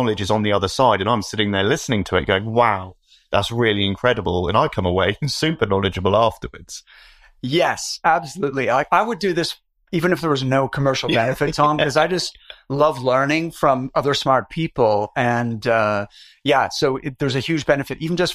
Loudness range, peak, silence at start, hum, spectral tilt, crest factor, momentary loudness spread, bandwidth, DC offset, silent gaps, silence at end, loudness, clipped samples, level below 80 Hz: 2 LU; -2 dBFS; 0 s; none; -5 dB/octave; 18 dB; 7 LU; 15.5 kHz; under 0.1%; none; 0 s; -19 LUFS; under 0.1%; -46 dBFS